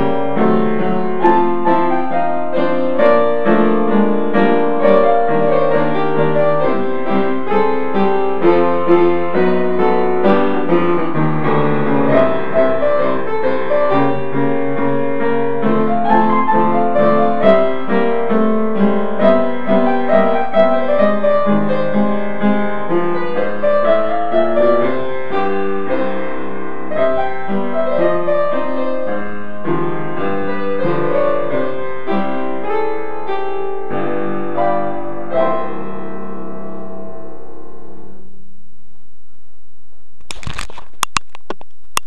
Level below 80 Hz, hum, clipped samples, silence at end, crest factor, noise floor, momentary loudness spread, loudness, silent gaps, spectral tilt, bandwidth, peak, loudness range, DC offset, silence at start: -52 dBFS; none; under 0.1%; 0.55 s; 18 dB; -57 dBFS; 10 LU; -16 LUFS; none; -6.5 dB/octave; 12 kHz; 0 dBFS; 8 LU; 20%; 0 s